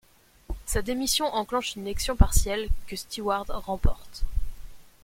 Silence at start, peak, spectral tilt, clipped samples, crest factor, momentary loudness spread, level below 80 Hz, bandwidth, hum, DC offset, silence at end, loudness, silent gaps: 0.5 s; -4 dBFS; -4 dB/octave; under 0.1%; 22 dB; 13 LU; -30 dBFS; 16.5 kHz; none; under 0.1%; 0.2 s; -28 LUFS; none